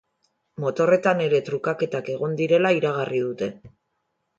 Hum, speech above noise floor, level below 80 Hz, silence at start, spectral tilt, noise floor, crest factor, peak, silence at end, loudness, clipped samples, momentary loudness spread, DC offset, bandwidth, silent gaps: none; 53 dB; -68 dBFS; 0.6 s; -6.5 dB/octave; -75 dBFS; 18 dB; -6 dBFS; 0.7 s; -23 LUFS; under 0.1%; 10 LU; under 0.1%; 7.8 kHz; none